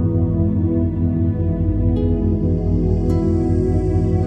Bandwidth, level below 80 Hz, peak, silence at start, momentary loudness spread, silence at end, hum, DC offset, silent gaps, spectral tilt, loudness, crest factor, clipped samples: 4.6 kHz; -26 dBFS; -6 dBFS; 0 s; 1 LU; 0 s; none; under 0.1%; none; -11 dB/octave; -19 LUFS; 10 dB; under 0.1%